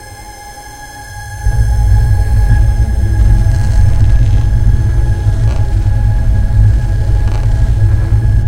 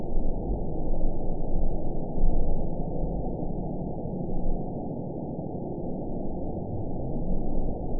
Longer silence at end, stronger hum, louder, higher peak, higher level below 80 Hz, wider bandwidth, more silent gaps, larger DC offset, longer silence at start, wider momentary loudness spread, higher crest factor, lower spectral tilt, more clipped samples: about the same, 0 s vs 0 s; neither; first, -12 LUFS vs -33 LUFS; first, 0 dBFS vs -10 dBFS; first, -12 dBFS vs -28 dBFS; first, 11 kHz vs 1 kHz; neither; second, under 0.1% vs 0.9%; about the same, 0 s vs 0 s; first, 17 LU vs 3 LU; about the same, 10 dB vs 14 dB; second, -7 dB/octave vs -17.5 dB/octave; neither